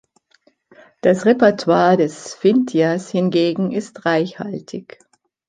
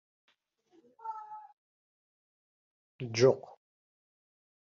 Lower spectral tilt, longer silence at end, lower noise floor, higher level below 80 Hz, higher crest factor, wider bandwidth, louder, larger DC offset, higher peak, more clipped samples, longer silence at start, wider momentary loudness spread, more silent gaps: about the same, -6 dB/octave vs -5 dB/octave; second, 0.65 s vs 1.2 s; second, -59 dBFS vs -70 dBFS; first, -64 dBFS vs -80 dBFS; second, 16 dB vs 24 dB; first, 9.6 kHz vs 7.2 kHz; first, -17 LUFS vs -29 LUFS; neither; first, -2 dBFS vs -12 dBFS; neither; about the same, 1.05 s vs 1.05 s; second, 14 LU vs 22 LU; second, none vs 1.53-2.99 s